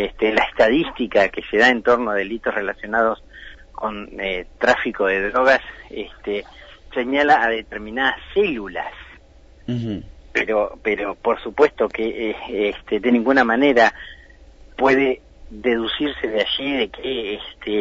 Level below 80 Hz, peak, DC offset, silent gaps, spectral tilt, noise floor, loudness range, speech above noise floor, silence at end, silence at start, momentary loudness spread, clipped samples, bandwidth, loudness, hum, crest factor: -46 dBFS; -4 dBFS; under 0.1%; none; -5 dB/octave; -47 dBFS; 4 LU; 27 dB; 0 s; 0 s; 13 LU; under 0.1%; 8 kHz; -20 LUFS; none; 18 dB